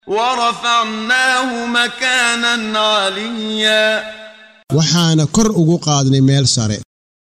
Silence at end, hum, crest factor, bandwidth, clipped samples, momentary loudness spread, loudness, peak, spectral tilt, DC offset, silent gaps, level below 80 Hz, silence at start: 0.4 s; none; 14 dB; 13.5 kHz; under 0.1%; 8 LU; -14 LUFS; -2 dBFS; -4 dB/octave; under 0.1%; none; -46 dBFS; 0.05 s